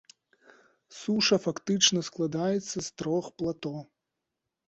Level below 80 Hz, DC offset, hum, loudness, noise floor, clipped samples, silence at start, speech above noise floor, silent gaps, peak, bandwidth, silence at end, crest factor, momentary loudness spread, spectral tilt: -68 dBFS; under 0.1%; none; -28 LUFS; -85 dBFS; under 0.1%; 0.9 s; 57 dB; none; -8 dBFS; 8.4 kHz; 0.85 s; 22 dB; 14 LU; -3.5 dB/octave